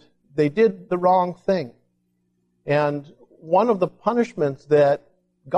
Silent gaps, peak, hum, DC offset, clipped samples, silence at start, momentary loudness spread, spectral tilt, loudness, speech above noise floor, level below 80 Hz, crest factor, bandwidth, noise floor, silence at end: none; -6 dBFS; 60 Hz at -50 dBFS; under 0.1%; under 0.1%; 0.35 s; 9 LU; -8 dB/octave; -21 LUFS; 49 dB; -64 dBFS; 16 dB; 8.4 kHz; -70 dBFS; 0 s